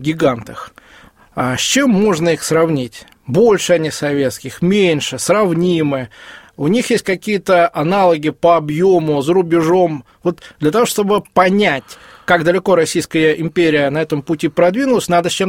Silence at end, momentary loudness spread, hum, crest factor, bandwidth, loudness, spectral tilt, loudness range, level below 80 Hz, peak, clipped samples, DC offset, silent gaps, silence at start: 0 s; 9 LU; none; 14 dB; 16.5 kHz; -15 LUFS; -5 dB/octave; 2 LU; -50 dBFS; 0 dBFS; under 0.1%; under 0.1%; none; 0 s